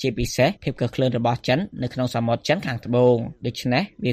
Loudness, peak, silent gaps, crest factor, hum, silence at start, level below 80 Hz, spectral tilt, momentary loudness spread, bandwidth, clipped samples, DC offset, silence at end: -23 LUFS; -6 dBFS; none; 16 dB; none; 0 s; -44 dBFS; -6 dB/octave; 7 LU; 15 kHz; under 0.1%; under 0.1%; 0 s